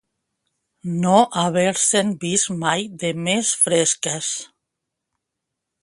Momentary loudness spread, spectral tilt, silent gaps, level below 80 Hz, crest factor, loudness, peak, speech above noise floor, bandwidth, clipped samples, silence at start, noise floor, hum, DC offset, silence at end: 10 LU; -3 dB/octave; none; -64 dBFS; 20 dB; -19 LUFS; -2 dBFS; 61 dB; 11.5 kHz; under 0.1%; 0.85 s; -81 dBFS; none; under 0.1%; 1.35 s